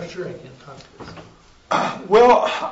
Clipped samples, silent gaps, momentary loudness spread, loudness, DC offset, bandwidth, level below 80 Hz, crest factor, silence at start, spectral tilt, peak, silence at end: under 0.1%; none; 26 LU; -16 LUFS; under 0.1%; 8 kHz; -54 dBFS; 14 dB; 0 s; -4.5 dB/octave; -4 dBFS; 0 s